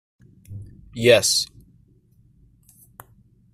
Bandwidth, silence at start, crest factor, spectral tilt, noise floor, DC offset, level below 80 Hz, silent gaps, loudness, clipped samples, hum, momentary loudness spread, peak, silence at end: 15.5 kHz; 0.5 s; 22 dB; -2.5 dB/octave; -57 dBFS; under 0.1%; -56 dBFS; none; -18 LUFS; under 0.1%; none; 25 LU; -2 dBFS; 2.1 s